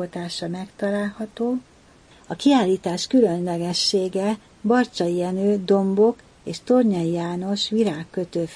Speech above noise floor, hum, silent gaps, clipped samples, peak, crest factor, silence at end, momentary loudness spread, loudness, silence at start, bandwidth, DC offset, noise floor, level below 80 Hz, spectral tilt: 30 dB; none; none; under 0.1%; -6 dBFS; 16 dB; 0 s; 10 LU; -22 LUFS; 0 s; 10.5 kHz; under 0.1%; -51 dBFS; -60 dBFS; -5.5 dB/octave